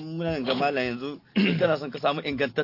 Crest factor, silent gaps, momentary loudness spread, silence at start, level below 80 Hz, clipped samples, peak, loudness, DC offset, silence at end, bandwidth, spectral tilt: 16 dB; none; 7 LU; 0 s; -58 dBFS; under 0.1%; -10 dBFS; -26 LUFS; under 0.1%; 0 s; 5.8 kHz; -7 dB/octave